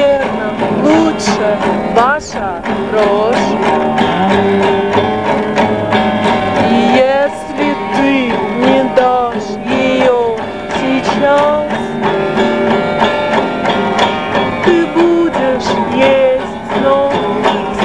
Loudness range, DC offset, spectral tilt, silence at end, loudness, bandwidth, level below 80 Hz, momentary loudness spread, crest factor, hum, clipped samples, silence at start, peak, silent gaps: 1 LU; 0.8%; -5.5 dB/octave; 0 s; -12 LUFS; 10.5 kHz; -42 dBFS; 6 LU; 12 dB; none; 0.1%; 0 s; 0 dBFS; none